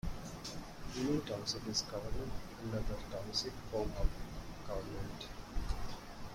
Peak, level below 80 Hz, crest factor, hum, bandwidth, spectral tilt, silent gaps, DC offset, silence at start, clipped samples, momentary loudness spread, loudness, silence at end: -18 dBFS; -44 dBFS; 20 dB; none; 16.5 kHz; -4.5 dB/octave; none; under 0.1%; 0.05 s; under 0.1%; 11 LU; -42 LUFS; 0 s